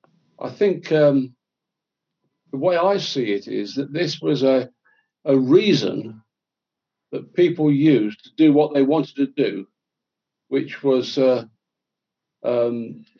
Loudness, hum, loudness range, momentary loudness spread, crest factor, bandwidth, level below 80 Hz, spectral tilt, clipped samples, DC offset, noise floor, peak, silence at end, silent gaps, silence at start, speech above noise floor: -20 LUFS; none; 4 LU; 15 LU; 18 dB; 7 kHz; -78 dBFS; -7 dB/octave; under 0.1%; under 0.1%; -86 dBFS; -4 dBFS; 0.2 s; none; 0.4 s; 66 dB